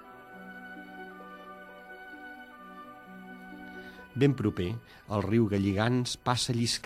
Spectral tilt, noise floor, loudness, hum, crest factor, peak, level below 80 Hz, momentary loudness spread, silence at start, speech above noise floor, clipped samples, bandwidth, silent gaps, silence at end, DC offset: -5.5 dB/octave; -48 dBFS; -29 LUFS; none; 22 dB; -10 dBFS; -60 dBFS; 20 LU; 0 s; 20 dB; under 0.1%; 15 kHz; none; 0.05 s; under 0.1%